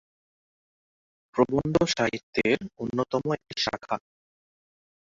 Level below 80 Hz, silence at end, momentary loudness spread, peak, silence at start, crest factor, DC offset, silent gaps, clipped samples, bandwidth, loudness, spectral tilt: -58 dBFS; 1.15 s; 9 LU; -8 dBFS; 1.35 s; 20 dB; under 0.1%; 2.23-2.33 s; under 0.1%; 7.8 kHz; -27 LUFS; -5 dB/octave